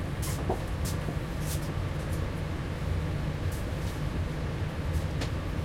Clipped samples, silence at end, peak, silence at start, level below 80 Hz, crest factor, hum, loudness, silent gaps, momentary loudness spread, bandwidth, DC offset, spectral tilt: under 0.1%; 0 s; -16 dBFS; 0 s; -38 dBFS; 14 dB; none; -33 LUFS; none; 2 LU; 16.5 kHz; under 0.1%; -6 dB/octave